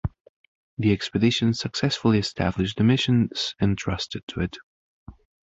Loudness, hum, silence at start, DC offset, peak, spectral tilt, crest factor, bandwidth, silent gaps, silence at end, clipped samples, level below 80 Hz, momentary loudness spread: -24 LUFS; none; 0.05 s; under 0.1%; -6 dBFS; -6 dB/octave; 18 dB; 8 kHz; 0.21-0.77 s, 4.23-4.27 s, 4.63-5.06 s; 0.35 s; under 0.1%; -44 dBFS; 10 LU